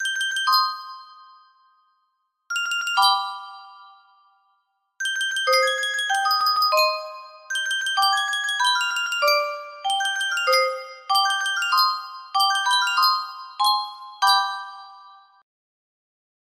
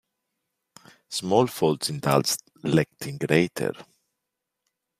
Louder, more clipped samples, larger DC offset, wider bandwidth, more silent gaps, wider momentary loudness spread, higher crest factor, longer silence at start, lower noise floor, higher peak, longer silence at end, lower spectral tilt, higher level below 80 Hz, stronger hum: first, -21 LUFS vs -25 LUFS; neither; neither; about the same, 16 kHz vs 15.5 kHz; neither; first, 14 LU vs 9 LU; about the same, 18 dB vs 22 dB; second, 0 s vs 1.1 s; second, -72 dBFS vs -83 dBFS; about the same, -6 dBFS vs -4 dBFS; about the same, 1.3 s vs 1.2 s; second, 3.5 dB/octave vs -5 dB/octave; second, -78 dBFS vs -62 dBFS; neither